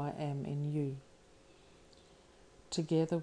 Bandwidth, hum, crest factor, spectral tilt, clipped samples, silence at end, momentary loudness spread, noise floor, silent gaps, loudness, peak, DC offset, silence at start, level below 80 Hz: 10.5 kHz; none; 18 dB; -7 dB/octave; under 0.1%; 0 s; 8 LU; -62 dBFS; none; -37 LUFS; -22 dBFS; under 0.1%; 0 s; -68 dBFS